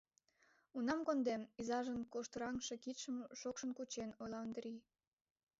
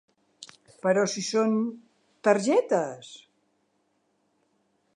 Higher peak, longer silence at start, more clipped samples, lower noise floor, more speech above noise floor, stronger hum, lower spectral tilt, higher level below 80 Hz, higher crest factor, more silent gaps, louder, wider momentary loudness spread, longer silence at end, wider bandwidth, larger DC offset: second, -28 dBFS vs -6 dBFS; first, 0.75 s vs 0.4 s; neither; first, -77 dBFS vs -72 dBFS; second, 33 dB vs 47 dB; neither; about the same, -3.5 dB/octave vs -4.5 dB/octave; first, -76 dBFS vs -84 dBFS; about the same, 18 dB vs 22 dB; neither; second, -44 LUFS vs -26 LUFS; second, 9 LU vs 17 LU; second, 0.8 s vs 1.8 s; second, 7.6 kHz vs 11 kHz; neither